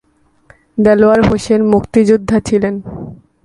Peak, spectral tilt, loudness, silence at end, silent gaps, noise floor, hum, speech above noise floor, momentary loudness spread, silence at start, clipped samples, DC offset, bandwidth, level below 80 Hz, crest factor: 0 dBFS; -7 dB/octave; -12 LUFS; 0.3 s; none; -48 dBFS; none; 37 dB; 17 LU; 0.75 s; under 0.1%; under 0.1%; 11.5 kHz; -36 dBFS; 12 dB